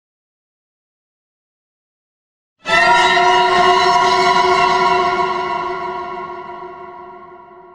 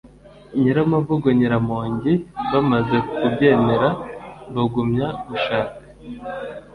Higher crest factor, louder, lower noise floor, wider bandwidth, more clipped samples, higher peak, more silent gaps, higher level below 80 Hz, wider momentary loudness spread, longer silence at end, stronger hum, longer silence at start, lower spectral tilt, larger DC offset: about the same, 16 dB vs 18 dB; first, -13 LUFS vs -20 LUFS; second, -39 dBFS vs -44 dBFS; first, 11.5 kHz vs 5.2 kHz; neither; first, 0 dBFS vs -4 dBFS; neither; about the same, -48 dBFS vs -48 dBFS; first, 19 LU vs 15 LU; about the same, 0.2 s vs 0.1 s; neither; first, 2.65 s vs 0.05 s; second, -3 dB/octave vs -9 dB/octave; neither